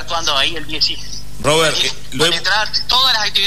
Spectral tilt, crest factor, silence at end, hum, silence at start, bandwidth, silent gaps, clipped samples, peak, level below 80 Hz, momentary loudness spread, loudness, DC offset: -2 dB/octave; 14 dB; 0 s; 50 Hz at -35 dBFS; 0 s; 13.5 kHz; none; under 0.1%; -2 dBFS; -38 dBFS; 7 LU; -15 LUFS; 8%